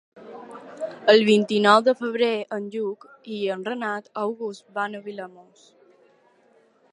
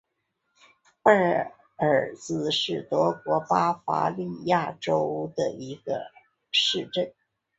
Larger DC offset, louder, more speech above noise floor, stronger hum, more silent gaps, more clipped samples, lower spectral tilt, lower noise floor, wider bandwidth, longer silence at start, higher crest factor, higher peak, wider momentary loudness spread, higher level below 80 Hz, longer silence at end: neither; first, -22 LUFS vs -26 LUFS; second, 37 dB vs 52 dB; neither; neither; neither; about the same, -5 dB/octave vs -4.5 dB/octave; second, -60 dBFS vs -78 dBFS; first, 11.5 kHz vs 8.2 kHz; second, 0.15 s vs 1.05 s; about the same, 24 dB vs 22 dB; about the same, -2 dBFS vs -4 dBFS; first, 24 LU vs 11 LU; second, -78 dBFS vs -68 dBFS; first, 1.5 s vs 0.5 s